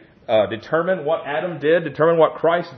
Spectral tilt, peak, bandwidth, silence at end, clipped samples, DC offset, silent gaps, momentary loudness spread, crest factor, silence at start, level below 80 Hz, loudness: -8 dB/octave; -2 dBFS; 6 kHz; 0 s; under 0.1%; under 0.1%; none; 6 LU; 18 dB; 0.3 s; -64 dBFS; -19 LUFS